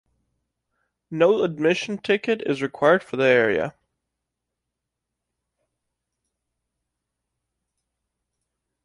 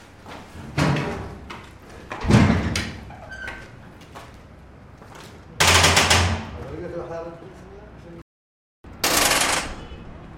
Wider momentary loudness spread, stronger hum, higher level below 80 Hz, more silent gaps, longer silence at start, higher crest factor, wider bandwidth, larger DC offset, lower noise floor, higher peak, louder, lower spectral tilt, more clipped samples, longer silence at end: second, 8 LU vs 26 LU; neither; second, -66 dBFS vs -40 dBFS; second, none vs 8.22-8.84 s; first, 1.1 s vs 0 s; about the same, 20 dB vs 22 dB; second, 11 kHz vs 16.5 kHz; neither; first, -83 dBFS vs -45 dBFS; second, -6 dBFS vs -2 dBFS; about the same, -21 LUFS vs -19 LUFS; first, -5.5 dB/octave vs -3.5 dB/octave; neither; first, 5.15 s vs 0 s